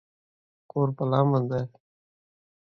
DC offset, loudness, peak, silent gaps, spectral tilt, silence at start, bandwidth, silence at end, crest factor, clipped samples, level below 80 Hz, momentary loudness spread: under 0.1%; -26 LUFS; -8 dBFS; none; -10.5 dB/octave; 0.75 s; 5.8 kHz; 0.95 s; 20 dB; under 0.1%; -66 dBFS; 11 LU